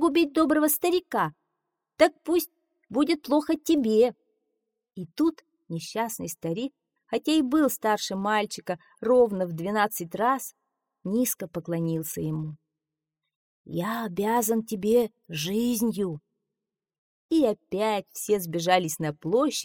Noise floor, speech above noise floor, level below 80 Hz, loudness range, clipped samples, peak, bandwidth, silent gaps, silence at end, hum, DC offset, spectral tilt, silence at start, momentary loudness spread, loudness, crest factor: -88 dBFS; 62 dB; -64 dBFS; 5 LU; under 0.1%; -4 dBFS; 19.5 kHz; 13.35-13.64 s, 16.98-17.29 s; 0 s; none; under 0.1%; -4.5 dB/octave; 0 s; 11 LU; -26 LUFS; 22 dB